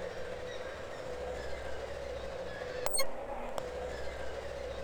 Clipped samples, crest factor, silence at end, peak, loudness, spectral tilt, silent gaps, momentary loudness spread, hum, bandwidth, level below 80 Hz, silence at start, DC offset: under 0.1%; 22 dB; 0 s; -14 dBFS; -39 LUFS; -3 dB/octave; none; 9 LU; none; over 20 kHz; -50 dBFS; 0 s; under 0.1%